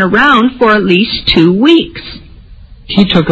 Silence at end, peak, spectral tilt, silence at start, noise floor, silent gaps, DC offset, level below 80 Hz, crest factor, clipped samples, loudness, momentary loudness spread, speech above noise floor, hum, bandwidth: 0 s; 0 dBFS; -7 dB/octave; 0 s; -34 dBFS; none; under 0.1%; -32 dBFS; 10 dB; 0.6%; -8 LUFS; 12 LU; 25 dB; none; 7.8 kHz